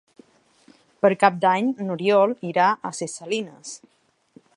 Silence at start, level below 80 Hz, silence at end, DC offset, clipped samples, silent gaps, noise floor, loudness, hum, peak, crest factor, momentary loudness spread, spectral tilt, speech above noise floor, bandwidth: 1.05 s; -74 dBFS; 0.8 s; under 0.1%; under 0.1%; none; -56 dBFS; -21 LUFS; none; -2 dBFS; 22 dB; 17 LU; -5 dB/octave; 35 dB; 11 kHz